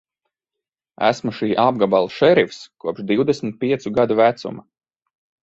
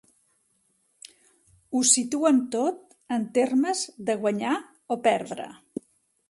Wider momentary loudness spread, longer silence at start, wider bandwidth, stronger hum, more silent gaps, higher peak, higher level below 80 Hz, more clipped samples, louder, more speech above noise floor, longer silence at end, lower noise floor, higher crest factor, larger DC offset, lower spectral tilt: second, 13 LU vs 18 LU; second, 1 s vs 1.7 s; second, 8 kHz vs 11.5 kHz; neither; neither; about the same, -2 dBFS vs -4 dBFS; first, -60 dBFS vs -74 dBFS; neither; first, -19 LUFS vs -25 LUFS; first, 67 dB vs 45 dB; about the same, 0.8 s vs 0.75 s; first, -86 dBFS vs -70 dBFS; about the same, 18 dB vs 22 dB; neither; first, -6 dB/octave vs -3 dB/octave